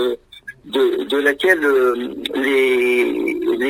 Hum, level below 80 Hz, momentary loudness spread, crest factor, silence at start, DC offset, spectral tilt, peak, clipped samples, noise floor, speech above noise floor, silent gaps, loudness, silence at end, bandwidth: none; -56 dBFS; 10 LU; 16 dB; 0 s; under 0.1%; -3.5 dB/octave; 0 dBFS; under 0.1%; -39 dBFS; 23 dB; none; -17 LUFS; 0 s; 16 kHz